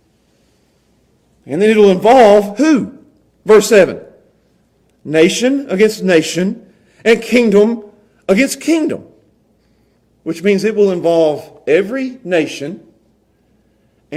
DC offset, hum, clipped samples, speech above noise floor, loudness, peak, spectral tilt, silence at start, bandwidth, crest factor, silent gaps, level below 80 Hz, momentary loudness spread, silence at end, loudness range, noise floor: under 0.1%; none; under 0.1%; 44 dB; -12 LUFS; 0 dBFS; -5 dB/octave; 1.45 s; 15 kHz; 14 dB; none; -54 dBFS; 17 LU; 0 s; 6 LU; -56 dBFS